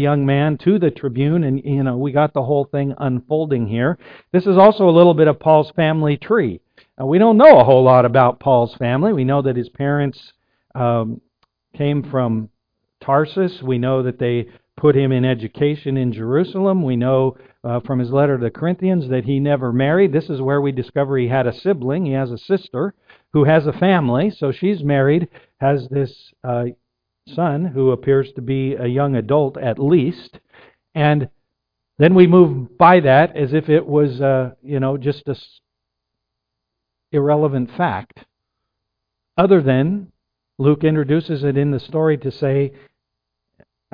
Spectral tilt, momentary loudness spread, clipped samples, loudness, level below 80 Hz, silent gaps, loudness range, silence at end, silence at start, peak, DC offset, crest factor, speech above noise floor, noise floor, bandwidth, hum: -11 dB/octave; 12 LU; under 0.1%; -17 LUFS; -52 dBFS; none; 9 LU; 1.25 s; 0 s; 0 dBFS; under 0.1%; 16 dB; 63 dB; -79 dBFS; 5.2 kHz; none